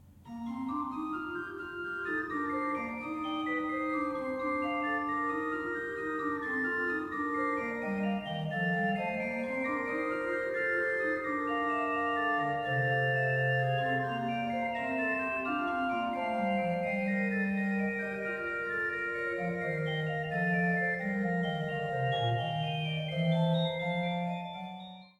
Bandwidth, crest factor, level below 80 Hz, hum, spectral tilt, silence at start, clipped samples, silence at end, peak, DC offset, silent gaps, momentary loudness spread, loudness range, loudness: 12 kHz; 14 dB; -66 dBFS; none; -7.5 dB/octave; 0.05 s; under 0.1%; 0.1 s; -20 dBFS; under 0.1%; none; 6 LU; 3 LU; -32 LUFS